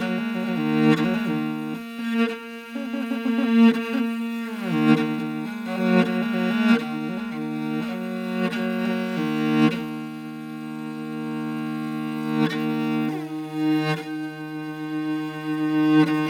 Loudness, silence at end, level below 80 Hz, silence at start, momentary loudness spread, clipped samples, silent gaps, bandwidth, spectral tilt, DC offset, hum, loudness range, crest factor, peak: -24 LUFS; 0 s; -70 dBFS; 0 s; 12 LU; under 0.1%; none; 16 kHz; -7 dB/octave; under 0.1%; none; 4 LU; 18 dB; -4 dBFS